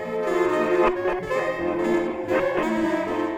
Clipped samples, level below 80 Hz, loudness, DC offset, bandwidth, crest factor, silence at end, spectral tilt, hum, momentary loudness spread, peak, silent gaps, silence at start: under 0.1%; -48 dBFS; -23 LUFS; under 0.1%; 14.5 kHz; 14 dB; 0 s; -6 dB/octave; none; 4 LU; -8 dBFS; none; 0 s